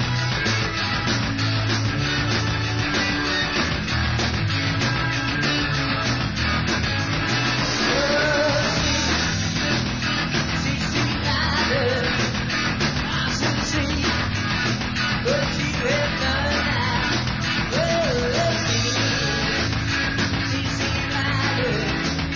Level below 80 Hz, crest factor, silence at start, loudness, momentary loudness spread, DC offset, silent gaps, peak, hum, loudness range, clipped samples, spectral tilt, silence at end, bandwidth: -34 dBFS; 14 dB; 0 s; -21 LUFS; 3 LU; 0.4%; none; -8 dBFS; none; 1 LU; under 0.1%; -4 dB/octave; 0 s; 7.6 kHz